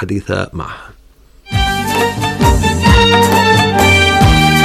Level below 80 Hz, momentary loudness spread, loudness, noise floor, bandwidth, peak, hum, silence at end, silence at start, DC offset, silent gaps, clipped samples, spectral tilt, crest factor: -22 dBFS; 12 LU; -11 LUFS; -44 dBFS; 15.5 kHz; -2 dBFS; none; 0 s; 0 s; under 0.1%; none; under 0.1%; -4.5 dB/octave; 10 dB